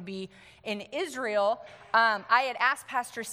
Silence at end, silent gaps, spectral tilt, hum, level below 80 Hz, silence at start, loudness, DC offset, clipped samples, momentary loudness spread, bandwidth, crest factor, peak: 0 s; none; -2.5 dB/octave; none; -74 dBFS; 0 s; -28 LUFS; under 0.1%; under 0.1%; 16 LU; 16.5 kHz; 20 dB; -8 dBFS